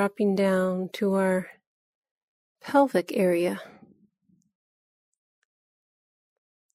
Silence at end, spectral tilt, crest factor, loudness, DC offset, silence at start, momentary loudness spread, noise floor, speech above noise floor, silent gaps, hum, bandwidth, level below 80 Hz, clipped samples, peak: 3.05 s; -6.5 dB/octave; 20 dB; -25 LUFS; under 0.1%; 0 s; 10 LU; -68 dBFS; 43 dB; 1.67-2.03 s, 2.11-2.55 s; none; 15 kHz; -72 dBFS; under 0.1%; -8 dBFS